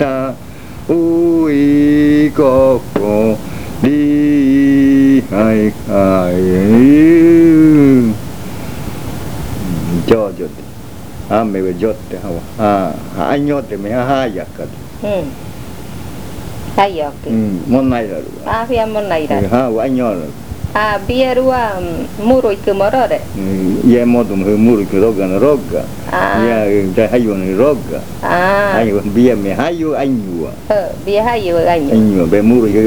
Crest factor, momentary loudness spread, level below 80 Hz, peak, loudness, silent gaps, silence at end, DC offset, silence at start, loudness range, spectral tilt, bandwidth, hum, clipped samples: 12 dB; 15 LU; -36 dBFS; 0 dBFS; -12 LUFS; none; 0 s; 3%; 0 s; 9 LU; -7.5 dB/octave; over 20 kHz; none; under 0.1%